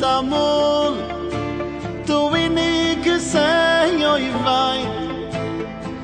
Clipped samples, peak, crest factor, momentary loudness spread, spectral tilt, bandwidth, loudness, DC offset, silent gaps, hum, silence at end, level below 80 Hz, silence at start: under 0.1%; -6 dBFS; 14 dB; 10 LU; -4.5 dB/octave; 10 kHz; -19 LUFS; under 0.1%; none; none; 0 s; -42 dBFS; 0 s